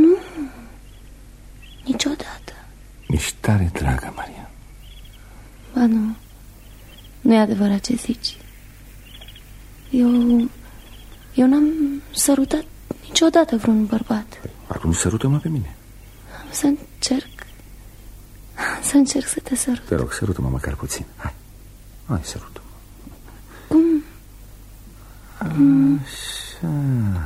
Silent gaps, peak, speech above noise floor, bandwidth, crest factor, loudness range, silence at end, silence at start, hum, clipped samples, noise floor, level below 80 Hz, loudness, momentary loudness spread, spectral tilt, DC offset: none; -2 dBFS; 23 dB; 16 kHz; 18 dB; 7 LU; 0 s; 0 s; none; under 0.1%; -42 dBFS; -38 dBFS; -20 LUFS; 23 LU; -5 dB/octave; under 0.1%